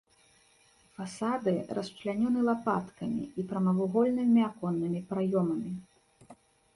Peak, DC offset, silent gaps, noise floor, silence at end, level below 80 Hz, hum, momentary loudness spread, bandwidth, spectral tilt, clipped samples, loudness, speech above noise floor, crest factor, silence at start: -16 dBFS; under 0.1%; none; -64 dBFS; 0.45 s; -68 dBFS; none; 9 LU; 11.5 kHz; -8 dB/octave; under 0.1%; -30 LUFS; 35 dB; 16 dB; 1 s